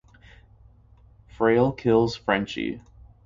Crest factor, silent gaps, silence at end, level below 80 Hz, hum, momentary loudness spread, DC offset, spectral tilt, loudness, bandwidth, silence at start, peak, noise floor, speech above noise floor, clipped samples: 18 dB; none; 0.45 s; -52 dBFS; none; 11 LU; under 0.1%; -7 dB/octave; -23 LUFS; 7.6 kHz; 1.4 s; -8 dBFS; -54 dBFS; 31 dB; under 0.1%